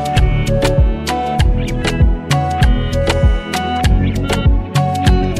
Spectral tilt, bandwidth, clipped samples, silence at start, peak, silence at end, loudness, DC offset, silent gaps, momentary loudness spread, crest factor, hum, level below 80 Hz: -6 dB/octave; 14 kHz; under 0.1%; 0 s; 0 dBFS; 0 s; -15 LUFS; under 0.1%; none; 4 LU; 12 dB; none; -16 dBFS